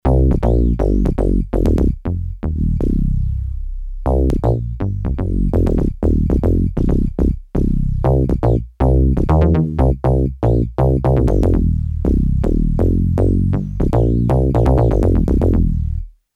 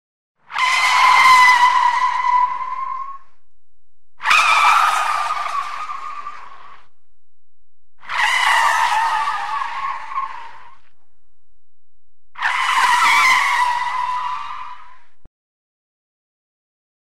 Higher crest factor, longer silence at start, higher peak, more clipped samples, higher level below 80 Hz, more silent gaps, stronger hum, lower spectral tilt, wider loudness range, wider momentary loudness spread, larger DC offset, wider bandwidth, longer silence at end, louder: second, 12 dB vs 18 dB; second, 0.05 s vs 0.35 s; about the same, -4 dBFS vs -2 dBFS; neither; first, -18 dBFS vs -60 dBFS; neither; neither; first, -10.5 dB/octave vs 1.5 dB/octave; second, 4 LU vs 12 LU; second, 7 LU vs 18 LU; second, under 0.1% vs 3%; second, 4.8 kHz vs 16 kHz; second, 0.25 s vs 1.8 s; about the same, -17 LUFS vs -15 LUFS